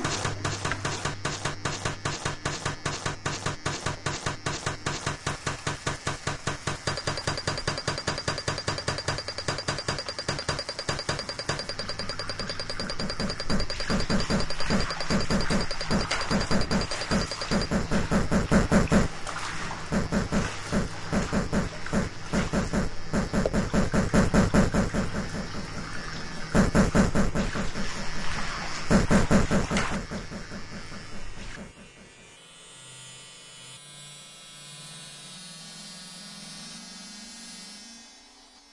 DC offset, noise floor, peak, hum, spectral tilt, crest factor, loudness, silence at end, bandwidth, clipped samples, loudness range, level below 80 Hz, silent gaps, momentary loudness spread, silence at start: under 0.1%; -53 dBFS; -8 dBFS; none; -4.5 dB/octave; 20 dB; -28 LUFS; 0.15 s; 11.5 kHz; under 0.1%; 15 LU; -38 dBFS; none; 18 LU; 0 s